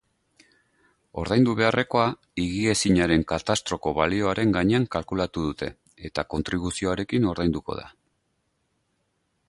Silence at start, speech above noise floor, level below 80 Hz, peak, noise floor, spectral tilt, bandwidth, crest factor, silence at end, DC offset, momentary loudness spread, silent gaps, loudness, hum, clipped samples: 1.15 s; 49 dB; -44 dBFS; -6 dBFS; -73 dBFS; -5 dB/octave; 11.5 kHz; 20 dB; 1.6 s; under 0.1%; 13 LU; none; -24 LUFS; none; under 0.1%